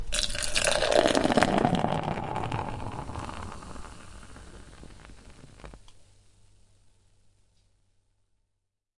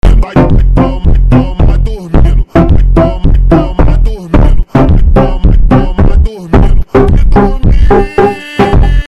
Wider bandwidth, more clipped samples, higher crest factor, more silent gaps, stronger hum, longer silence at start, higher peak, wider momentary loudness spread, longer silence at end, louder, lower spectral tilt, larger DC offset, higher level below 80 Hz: first, 11.5 kHz vs 5.6 kHz; neither; first, 28 dB vs 6 dB; neither; neither; about the same, 0 s vs 0.05 s; about the same, -2 dBFS vs 0 dBFS; first, 26 LU vs 3 LU; first, 2.5 s vs 0 s; second, -27 LUFS vs -9 LUFS; second, -4 dB/octave vs -9 dB/octave; first, 0.1% vs under 0.1%; second, -44 dBFS vs -8 dBFS